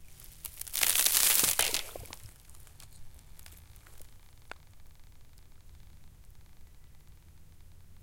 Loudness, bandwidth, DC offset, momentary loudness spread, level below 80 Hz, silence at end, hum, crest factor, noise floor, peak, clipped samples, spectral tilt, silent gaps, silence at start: -25 LUFS; 17 kHz; under 0.1%; 28 LU; -54 dBFS; 0.05 s; none; 34 dB; -52 dBFS; -2 dBFS; under 0.1%; 0.5 dB/octave; none; 0 s